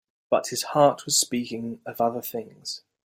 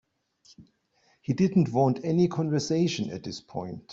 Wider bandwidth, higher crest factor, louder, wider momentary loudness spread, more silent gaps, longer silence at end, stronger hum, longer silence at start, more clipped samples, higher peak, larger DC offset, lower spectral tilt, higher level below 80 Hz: first, 16 kHz vs 7.8 kHz; about the same, 20 dB vs 18 dB; about the same, -25 LUFS vs -27 LUFS; about the same, 14 LU vs 14 LU; neither; first, 0.3 s vs 0 s; neither; second, 0.3 s vs 0.6 s; neither; first, -6 dBFS vs -10 dBFS; neither; second, -3 dB/octave vs -7 dB/octave; second, -70 dBFS vs -64 dBFS